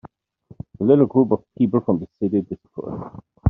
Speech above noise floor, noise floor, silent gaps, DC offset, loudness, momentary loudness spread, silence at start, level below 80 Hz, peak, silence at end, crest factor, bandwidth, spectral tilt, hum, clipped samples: 31 dB; -51 dBFS; none; under 0.1%; -20 LUFS; 20 LU; 0.8 s; -56 dBFS; -2 dBFS; 0 s; 18 dB; 3.7 kHz; -11 dB/octave; none; under 0.1%